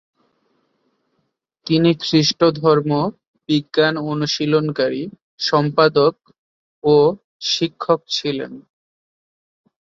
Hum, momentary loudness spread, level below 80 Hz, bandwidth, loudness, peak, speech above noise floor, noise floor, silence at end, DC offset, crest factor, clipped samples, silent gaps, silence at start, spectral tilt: none; 10 LU; -60 dBFS; 7.6 kHz; -18 LUFS; -2 dBFS; 54 dB; -71 dBFS; 1.3 s; under 0.1%; 18 dB; under 0.1%; 3.27-3.34 s, 5.22-5.38 s, 6.38-6.82 s, 7.24-7.40 s; 1.65 s; -5.5 dB/octave